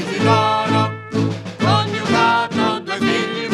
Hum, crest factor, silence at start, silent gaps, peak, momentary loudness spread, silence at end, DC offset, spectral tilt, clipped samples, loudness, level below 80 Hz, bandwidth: none; 16 dB; 0 s; none; -2 dBFS; 6 LU; 0 s; under 0.1%; -5.5 dB/octave; under 0.1%; -17 LUFS; -58 dBFS; 11.5 kHz